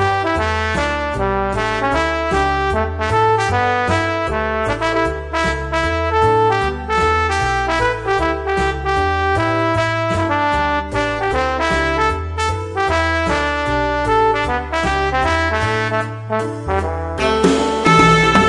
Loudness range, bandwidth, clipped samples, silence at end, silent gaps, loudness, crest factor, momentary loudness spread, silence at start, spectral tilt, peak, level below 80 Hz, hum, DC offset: 1 LU; 11.5 kHz; under 0.1%; 0 s; none; -17 LUFS; 16 dB; 5 LU; 0 s; -5 dB/octave; 0 dBFS; -30 dBFS; none; under 0.1%